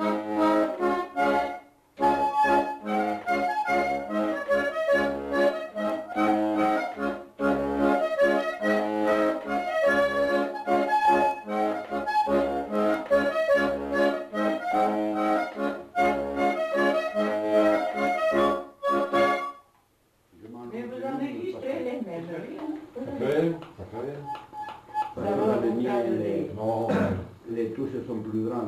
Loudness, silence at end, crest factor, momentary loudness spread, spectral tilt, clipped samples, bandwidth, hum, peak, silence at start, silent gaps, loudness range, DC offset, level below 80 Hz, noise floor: -26 LUFS; 0 s; 14 dB; 11 LU; -6 dB/octave; under 0.1%; 14 kHz; none; -12 dBFS; 0 s; none; 7 LU; under 0.1%; -58 dBFS; -66 dBFS